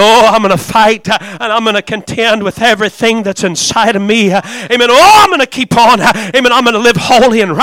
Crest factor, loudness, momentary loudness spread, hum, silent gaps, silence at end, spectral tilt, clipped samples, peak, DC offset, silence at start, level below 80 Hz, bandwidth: 8 dB; -8 LUFS; 9 LU; none; none; 0 s; -3.5 dB/octave; 0.2%; 0 dBFS; under 0.1%; 0 s; -40 dBFS; 17 kHz